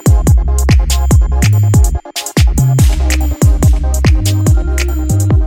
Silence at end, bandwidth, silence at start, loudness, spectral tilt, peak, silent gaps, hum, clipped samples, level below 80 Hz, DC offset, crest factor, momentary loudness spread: 0 s; 17 kHz; 0.05 s; -12 LUFS; -5.5 dB/octave; 0 dBFS; none; none; under 0.1%; -12 dBFS; under 0.1%; 10 dB; 4 LU